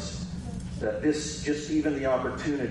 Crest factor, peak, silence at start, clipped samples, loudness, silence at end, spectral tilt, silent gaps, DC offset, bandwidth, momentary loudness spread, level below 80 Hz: 14 dB; -14 dBFS; 0 s; under 0.1%; -29 LUFS; 0 s; -5 dB/octave; none; under 0.1%; 11.5 kHz; 9 LU; -46 dBFS